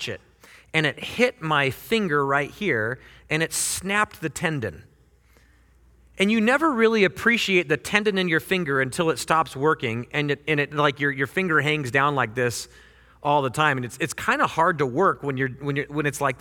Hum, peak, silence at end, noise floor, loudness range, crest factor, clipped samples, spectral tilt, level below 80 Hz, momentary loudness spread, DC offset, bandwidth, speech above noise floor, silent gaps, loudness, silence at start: none; -2 dBFS; 0.05 s; -57 dBFS; 4 LU; 22 dB; under 0.1%; -4.5 dB/octave; -56 dBFS; 7 LU; under 0.1%; 18.5 kHz; 34 dB; none; -23 LUFS; 0 s